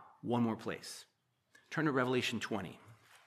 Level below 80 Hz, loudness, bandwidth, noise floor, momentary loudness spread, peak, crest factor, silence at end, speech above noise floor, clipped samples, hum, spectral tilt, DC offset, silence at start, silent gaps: -80 dBFS; -36 LUFS; 14.5 kHz; -70 dBFS; 16 LU; -18 dBFS; 20 dB; 0.35 s; 34 dB; under 0.1%; none; -5 dB/octave; under 0.1%; 0 s; none